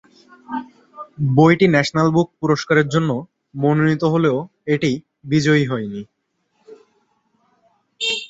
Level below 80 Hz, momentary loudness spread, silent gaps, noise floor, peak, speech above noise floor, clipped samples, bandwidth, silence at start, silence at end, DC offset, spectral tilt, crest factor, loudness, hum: -56 dBFS; 16 LU; none; -68 dBFS; -2 dBFS; 51 dB; under 0.1%; 8 kHz; 0.5 s; 0.05 s; under 0.1%; -6.5 dB/octave; 18 dB; -18 LUFS; none